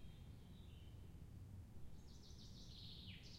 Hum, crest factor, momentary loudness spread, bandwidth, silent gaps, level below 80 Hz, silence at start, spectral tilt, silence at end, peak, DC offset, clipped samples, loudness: none; 14 dB; 5 LU; 16 kHz; none; -64 dBFS; 0 s; -5 dB/octave; 0 s; -44 dBFS; under 0.1%; under 0.1%; -59 LUFS